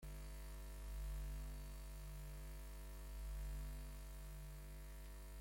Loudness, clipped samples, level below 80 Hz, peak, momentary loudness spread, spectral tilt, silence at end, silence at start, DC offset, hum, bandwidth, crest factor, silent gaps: -54 LUFS; under 0.1%; -50 dBFS; -40 dBFS; 6 LU; -5 dB/octave; 0 s; 0 s; under 0.1%; 50 Hz at -50 dBFS; 16.5 kHz; 10 dB; none